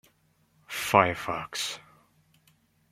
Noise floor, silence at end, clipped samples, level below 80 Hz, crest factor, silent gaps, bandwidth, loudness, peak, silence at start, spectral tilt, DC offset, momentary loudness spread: -67 dBFS; 1.1 s; under 0.1%; -64 dBFS; 28 dB; none; 16.5 kHz; -27 LUFS; -2 dBFS; 0.7 s; -3.5 dB/octave; under 0.1%; 14 LU